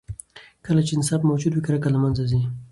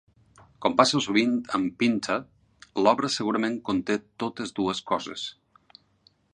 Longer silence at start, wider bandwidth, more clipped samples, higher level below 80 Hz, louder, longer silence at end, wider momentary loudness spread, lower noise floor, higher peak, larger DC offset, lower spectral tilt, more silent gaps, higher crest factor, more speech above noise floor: second, 0.1 s vs 0.6 s; about the same, 11.5 kHz vs 10.5 kHz; neither; first, -46 dBFS vs -64 dBFS; first, -22 LUFS vs -26 LUFS; second, 0.05 s vs 1 s; first, 15 LU vs 11 LU; second, -46 dBFS vs -64 dBFS; second, -8 dBFS vs -2 dBFS; neither; first, -6.5 dB/octave vs -4 dB/octave; neither; second, 14 dB vs 24 dB; second, 25 dB vs 39 dB